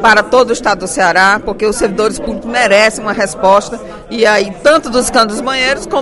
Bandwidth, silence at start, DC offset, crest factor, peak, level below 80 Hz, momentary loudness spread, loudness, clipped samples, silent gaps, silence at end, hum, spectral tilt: 12 kHz; 0 s; under 0.1%; 12 dB; 0 dBFS; -38 dBFS; 7 LU; -11 LUFS; 0.4%; none; 0 s; none; -3 dB/octave